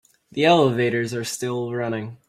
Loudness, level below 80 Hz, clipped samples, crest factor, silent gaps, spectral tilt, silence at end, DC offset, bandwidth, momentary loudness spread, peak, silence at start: -21 LUFS; -62 dBFS; under 0.1%; 20 dB; none; -5 dB/octave; 0.15 s; under 0.1%; 15.5 kHz; 10 LU; -4 dBFS; 0.35 s